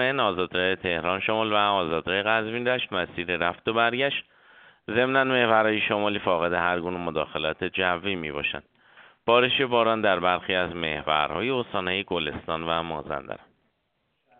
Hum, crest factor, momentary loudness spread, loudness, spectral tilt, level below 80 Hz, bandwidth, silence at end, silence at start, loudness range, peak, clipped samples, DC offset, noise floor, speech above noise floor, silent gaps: none; 22 dB; 8 LU; -25 LUFS; -2 dB/octave; -56 dBFS; 4.7 kHz; 1.05 s; 0 s; 3 LU; -4 dBFS; under 0.1%; under 0.1%; -74 dBFS; 49 dB; none